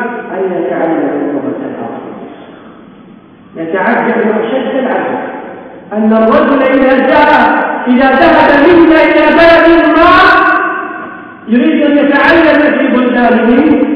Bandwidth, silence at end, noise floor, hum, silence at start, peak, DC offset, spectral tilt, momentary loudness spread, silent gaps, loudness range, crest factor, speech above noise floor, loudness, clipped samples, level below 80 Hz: 5.4 kHz; 0 s; -36 dBFS; none; 0 s; 0 dBFS; under 0.1%; -7.5 dB/octave; 17 LU; none; 11 LU; 8 dB; 29 dB; -8 LUFS; 1%; -38 dBFS